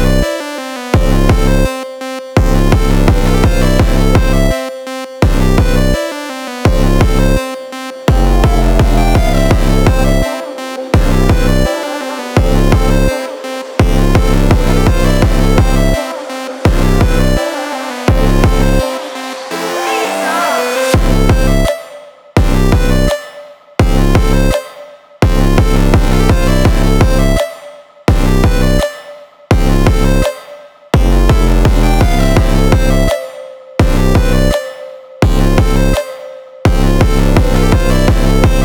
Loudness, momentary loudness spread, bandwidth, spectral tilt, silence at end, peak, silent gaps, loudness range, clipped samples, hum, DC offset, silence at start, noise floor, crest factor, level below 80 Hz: -13 LUFS; 10 LU; 19 kHz; -6 dB/octave; 0 s; 0 dBFS; none; 2 LU; under 0.1%; none; under 0.1%; 0 s; -34 dBFS; 10 dB; -14 dBFS